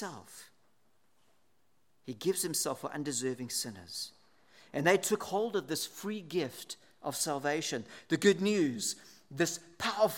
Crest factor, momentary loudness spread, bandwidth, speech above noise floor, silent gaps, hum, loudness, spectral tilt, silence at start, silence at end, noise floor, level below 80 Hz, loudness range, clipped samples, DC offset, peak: 22 dB; 16 LU; 17.5 kHz; 43 dB; none; none; -33 LUFS; -3.5 dB/octave; 0 s; 0 s; -76 dBFS; -80 dBFS; 4 LU; under 0.1%; under 0.1%; -12 dBFS